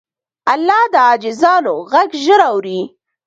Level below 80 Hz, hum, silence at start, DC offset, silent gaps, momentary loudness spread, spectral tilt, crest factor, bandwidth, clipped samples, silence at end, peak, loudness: -64 dBFS; none; 0.45 s; under 0.1%; none; 11 LU; -4 dB/octave; 14 dB; 8.8 kHz; under 0.1%; 0.4 s; 0 dBFS; -13 LUFS